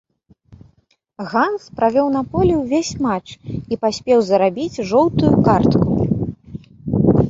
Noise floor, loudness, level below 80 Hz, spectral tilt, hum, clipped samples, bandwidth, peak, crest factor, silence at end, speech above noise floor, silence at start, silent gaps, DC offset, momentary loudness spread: -60 dBFS; -17 LUFS; -38 dBFS; -7 dB/octave; none; under 0.1%; 7.8 kHz; -2 dBFS; 16 dB; 0 s; 43 dB; 1.2 s; none; under 0.1%; 14 LU